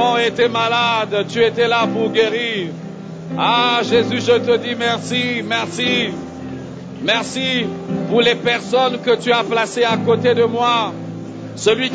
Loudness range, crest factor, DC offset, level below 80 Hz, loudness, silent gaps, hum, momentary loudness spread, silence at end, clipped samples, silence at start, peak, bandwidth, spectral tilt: 3 LU; 16 dB; under 0.1%; -56 dBFS; -17 LUFS; none; none; 14 LU; 0 s; under 0.1%; 0 s; -2 dBFS; 8 kHz; -4.5 dB/octave